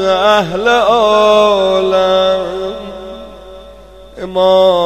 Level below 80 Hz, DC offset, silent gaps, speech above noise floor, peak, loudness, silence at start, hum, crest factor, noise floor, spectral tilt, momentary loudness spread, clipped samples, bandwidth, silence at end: -42 dBFS; under 0.1%; none; 26 dB; 0 dBFS; -11 LUFS; 0 s; none; 12 dB; -36 dBFS; -4.5 dB/octave; 19 LU; under 0.1%; 14 kHz; 0 s